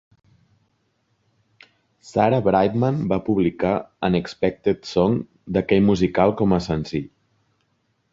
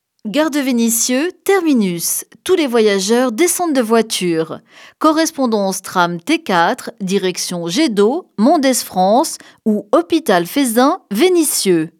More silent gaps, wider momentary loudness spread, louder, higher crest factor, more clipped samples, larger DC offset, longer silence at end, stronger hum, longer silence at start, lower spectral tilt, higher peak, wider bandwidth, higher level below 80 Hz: neither; about the same, 8 LU vs 6 LU; second, -21 LUFS vs -15 LUFS; about the same, 20 dB vs 16 dB; neither; neither; first, 1.05 s vs 0.1 s; neither; first, 2.05 s vs 0.25 s; first, -7.5 dB/octave vs -3.5 dB/octave; about the same, -2 dBFS vs 0 dBFS; second, 7.6 kHz vs 18.5 kHz; first, -46 dBFS vs -68 dBFS